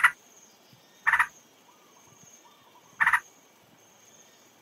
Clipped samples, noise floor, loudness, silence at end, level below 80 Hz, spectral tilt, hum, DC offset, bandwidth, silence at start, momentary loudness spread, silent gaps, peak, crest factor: under 0.1%; -58 dBFS; -25 LUFS; 1.4 s; -72 dBFS; 0 dB/octave; none; under 0.1%; 16 kHz; 0 s; 6 LU; none; -8 dBFS; 24 dB